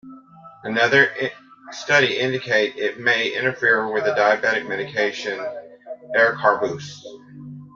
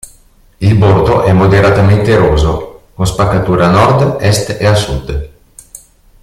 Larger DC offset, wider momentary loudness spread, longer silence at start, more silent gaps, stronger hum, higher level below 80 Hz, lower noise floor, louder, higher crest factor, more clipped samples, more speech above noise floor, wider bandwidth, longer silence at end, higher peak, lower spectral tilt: neither; first, 21 LU vs 11 LU; second, 0.05 s vs 0.6 s; neither; neither; second, -66 dBFS vs -26 dBFS; about the same, -45 dBFS vs -44 dBFS; second, -20 LUFS vs -10 LUFS; first, 20 dB vs 10 dB; neither; second, 25 dB vs 35 dB; second, 7.6 kHz vs 14 kHz; second, 0.05 s vs 0.45 s; about the same, -2 dBFS vs 0 dBFS; second, -4 dB/octave vs -6.5 dB/octave